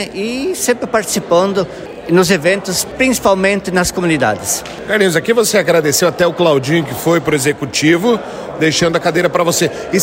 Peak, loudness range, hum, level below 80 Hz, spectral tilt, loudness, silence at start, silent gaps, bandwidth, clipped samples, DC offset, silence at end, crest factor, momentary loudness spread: 0 dBFS; 1 LU; none; -44 dBFS; -4 dB/octave; -14 LUFS; 0 s; none; 16.5 kHz; under 0.1%; under 0.1%; 0 s; 14 dB; 6 LU